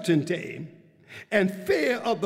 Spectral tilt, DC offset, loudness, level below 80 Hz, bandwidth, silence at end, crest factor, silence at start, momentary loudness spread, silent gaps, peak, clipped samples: -6 dB/octave; under 0.1%; -26 LUFS; -66 dBFS; 16 kHz; 0 s; 20 dB; 0 s; 20 LU; none; -8 dBFS; under 0.1%